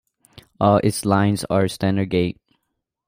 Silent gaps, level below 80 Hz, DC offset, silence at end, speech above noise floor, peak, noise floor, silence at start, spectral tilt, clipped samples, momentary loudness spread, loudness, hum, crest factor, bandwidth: none; -52 dBFS; under 0.1%; 0.75 s; 58 dB; -4 dBFS; -77 dBFS; 0.6 s; -6 dB/octave; under 0.1%; 5 LU; -20 LUFS; none; 16 dB; 16 kHz